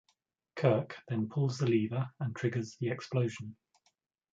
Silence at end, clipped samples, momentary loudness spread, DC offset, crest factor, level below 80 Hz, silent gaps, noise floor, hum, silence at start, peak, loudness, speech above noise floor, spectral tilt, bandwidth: 0.8 s; under 0.1%; 8 LU; under 0.1%; 22 dB; -72 dBFS; none; -78 dBFS; none; 0.55 s; -12 dBFS; -33 LUFS; 45 dB; -7.5 dB/octave; 7.8 kHz